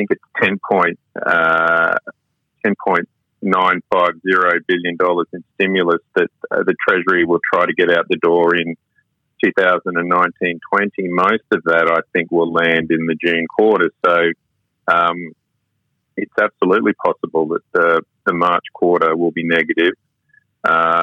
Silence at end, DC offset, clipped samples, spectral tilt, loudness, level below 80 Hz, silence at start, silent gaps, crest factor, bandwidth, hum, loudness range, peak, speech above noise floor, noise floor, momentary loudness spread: 0 s; under 0.1%; under 0.1%; -7 dB/octave; -16 LUFS; -64 dBFS; 0 s; none; 14 dB; 7.4 kHz; none; 2 LU; -2 dBFS; 54 dB; -70 dBFS; 7 LU